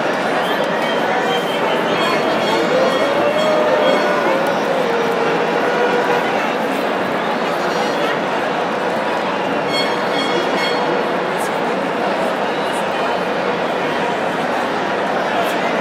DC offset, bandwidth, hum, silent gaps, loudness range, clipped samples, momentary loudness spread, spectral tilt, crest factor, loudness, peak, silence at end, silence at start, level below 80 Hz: under 0.1%; 16 kHz; none; none; 3 LU; under 0.1%; 4 LU; -4.5 dB/octave; 14 dB; -17 LUFS; -2 dBFS; 0 s; 0 s; -60 dBFS